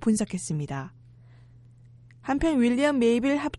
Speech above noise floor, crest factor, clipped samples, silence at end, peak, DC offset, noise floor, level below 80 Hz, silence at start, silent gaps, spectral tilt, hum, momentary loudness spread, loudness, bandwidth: 27 dB; 16 dB; under 0.1%; 0 s; -10 dBFS; under 0.1%; -52 dBFS; -48 dBFS; 0 s; none; -5.5 dB/octave; none; 14 LU; -25 LUFS; 11.5 kHz